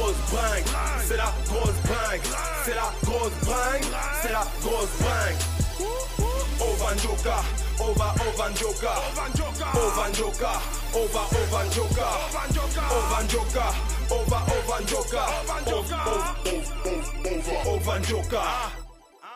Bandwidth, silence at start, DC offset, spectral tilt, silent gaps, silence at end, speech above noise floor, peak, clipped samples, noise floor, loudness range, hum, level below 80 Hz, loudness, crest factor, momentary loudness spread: 16 kHz; 0 s; under 0.1%; -4 dB/octave; none; 0 s; 20 dB; -14 dBFS; under 0.1%; -46 dBFS; 2 LU; none; -30 dBFS; -26 LUFS; 12 dB; 4 LU